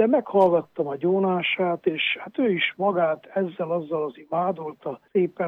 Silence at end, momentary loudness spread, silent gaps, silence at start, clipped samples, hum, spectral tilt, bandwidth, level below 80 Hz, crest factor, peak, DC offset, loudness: 0 s; 9 LU; none; 0 s; under 0.1%; none; -8 dB/octave; 5 kHz; -72 dBFS; 16 dB; -8 dBFS; under 0.1%; -24 LUFS